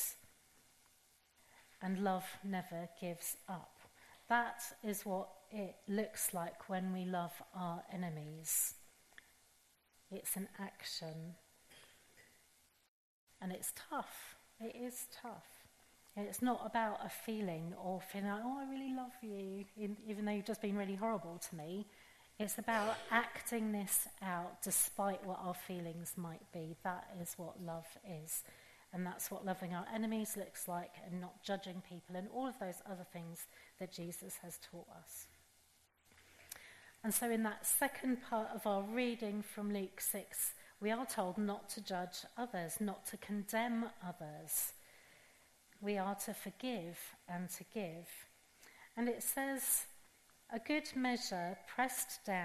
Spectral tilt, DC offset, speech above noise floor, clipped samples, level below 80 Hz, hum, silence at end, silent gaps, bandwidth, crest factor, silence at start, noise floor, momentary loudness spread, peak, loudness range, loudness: -3.5 dB/octave; under 0.1%; 30 dB; under 0.1%; -78 dBFS; none; 0 s; 12.88-13.27 s; 13.5 kHz; 26 dB; 0 s; -72 dBFS; 16 LU; -18 dBFS; 9 LU; -42 LUFS